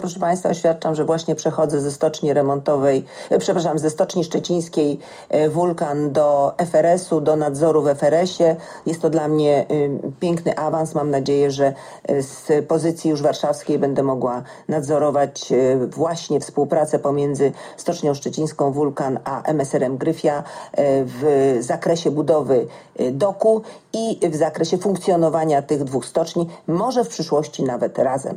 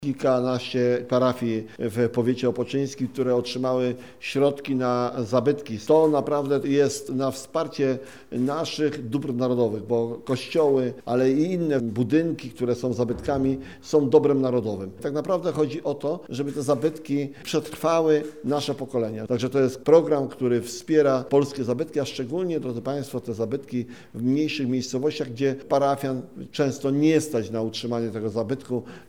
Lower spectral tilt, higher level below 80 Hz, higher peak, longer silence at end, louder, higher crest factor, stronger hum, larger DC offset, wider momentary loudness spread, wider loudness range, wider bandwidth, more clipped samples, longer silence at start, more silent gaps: about the same, -6 dB/octave vs -6.5 dB/octave; about the same, -60 dBFS vs -58 dBFS; about the same, -4 dBFS vs -4 dBFS; about the same, 0 s vs 0.05 s; first, -20 LUFS vs -24 LUFS; second, 14 dB vs 20 dB; neither; second, under 0.1% vs 0.2%; second, 6 LU vs 9 LU; about the same, 3 LU vs 3 LU; second, 15 kHz vs 17 kHz; neither; about the same, 0 s vs 0 s; neither